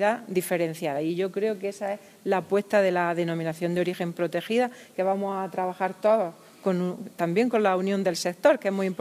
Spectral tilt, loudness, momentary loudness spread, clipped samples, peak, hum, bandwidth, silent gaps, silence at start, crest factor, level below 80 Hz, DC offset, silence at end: -5.5 dB/octave; -26 LUFS; 8 LU; under 0.1%; -6 dBFS; none; 16 kHz; none; 0 s; 20 dB; -78 dBFS; under 0.1%; 0.05 s